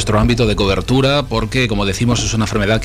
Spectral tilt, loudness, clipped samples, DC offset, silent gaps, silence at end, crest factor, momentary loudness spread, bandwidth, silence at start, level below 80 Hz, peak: -5 dB/octave; -15 LUFS; under 0.1%; under 0.1%; none; 0 s; 12 dB; 3 LU; 14.5 kHz; 0 s; -26 dBFS; -4 dBFS